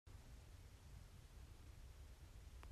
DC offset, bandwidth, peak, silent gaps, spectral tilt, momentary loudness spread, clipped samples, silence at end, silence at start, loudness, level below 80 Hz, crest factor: under 0.1%; 14.5 kHz; -42 dBFS; none; -5 dB/octave; 1 LU; under 0.1%; 0 s; 0.05 s; -63 LUFS; -62 dBFS; 16 dB